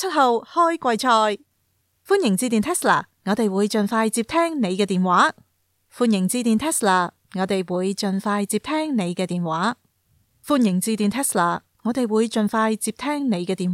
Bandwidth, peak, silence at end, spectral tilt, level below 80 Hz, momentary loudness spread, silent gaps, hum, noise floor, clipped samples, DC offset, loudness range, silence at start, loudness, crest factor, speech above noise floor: 16.5 kHz; -4 dBFS; 0 s; -4.5 dB/octave; -62 dBFS; 6 LU; none; none; -68 dBFS; under 0.1%; under 0.1%; 3 LU; 0 s; -21 LUFS; 16 dB; 48 dB